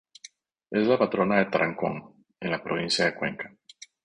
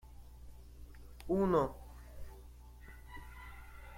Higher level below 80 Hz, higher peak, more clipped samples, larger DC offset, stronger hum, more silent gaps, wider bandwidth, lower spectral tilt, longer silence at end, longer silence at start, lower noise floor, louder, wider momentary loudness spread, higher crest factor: second, -64 dBFS vs -52 dBFS; first, -6 dBFS vs -18 dBFS; neither; neither; second, none vs 60 Hz at -55 dBFS; neither; second, 10.5 kHz vs 16.5 kHz; second, -5 dB/octave vs -8 dB/octave; first, 0.55 s vs 0 s; first, 0.7 s vs 0.05 s; about the same, -52 dBFS vs -54 dBFS; first, -26 LUFS vs -34 LUFS; second, 13 LU vs 25 LU; about the same, 22 dB vs 22 dB